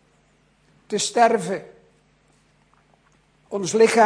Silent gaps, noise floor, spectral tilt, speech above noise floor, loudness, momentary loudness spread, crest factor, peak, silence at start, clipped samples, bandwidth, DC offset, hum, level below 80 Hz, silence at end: none; -61 dBFS; -3.5 dB/octave; 42 dB; -21 LUFS; 13 LU; 18 dB; -4 dBFS; 0.9 s; under 0.1%; 10.5 kHz; under 0.1%; none; -68 dBFS; 0 s